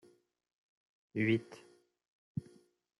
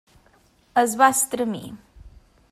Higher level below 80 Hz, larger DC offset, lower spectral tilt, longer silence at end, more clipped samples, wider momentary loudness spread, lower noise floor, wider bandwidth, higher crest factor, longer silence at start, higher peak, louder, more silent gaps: second, -76 dBFS vs -54 dBFS; neither; first, -7.5 dB/octave vs -2.5 dB/octave; first, 0.6 s vs 0.45 s; neither; first, 22 LU vs 16 LU; first, -64 dBFS vs -59 dBFS; second, 11.5 kHz vs 15.5 kHz; about the same, 22 dB vs 20 dB; first, 1.15 s vs 0.75 s; second, -18 dBFS vs -4 dBFS; second, -37 LUFS vs -20 LUFS; first, 2.08-2.35 s vs none